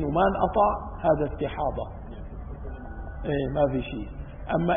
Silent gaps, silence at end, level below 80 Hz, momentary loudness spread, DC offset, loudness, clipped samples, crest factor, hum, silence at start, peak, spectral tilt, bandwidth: none; 0 s; -38 dBFS; 17 LU; under 0.1%; -26 LUFS; under 0.1%; 16 dB; none; 0 s; -10 dBFS; -11.5 dB/octave; 3.7 kHz